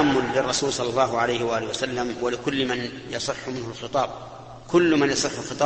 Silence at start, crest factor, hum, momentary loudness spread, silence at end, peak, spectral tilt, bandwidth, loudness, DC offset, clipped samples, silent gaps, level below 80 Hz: 0 s; 18 dB; none; 11 LU; 0 s; -6 dBFS; -4 dB/octave; 8.8 kHz; -24 LUFS; under 0.1%; under 0.1%; none; -52 dBFS